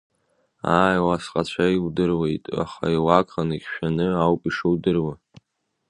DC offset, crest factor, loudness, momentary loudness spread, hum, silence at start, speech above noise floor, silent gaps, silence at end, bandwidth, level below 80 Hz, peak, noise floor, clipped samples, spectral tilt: under 0.1%; 22 dB; -22 LUFS; 8 LU; none; 0.65 s; 54 dB; none; 0.75 s; 10.5 kHz; -48 dBFS; 0 dBFS; -75 dBFS; under 0.1%; -7 dB/octave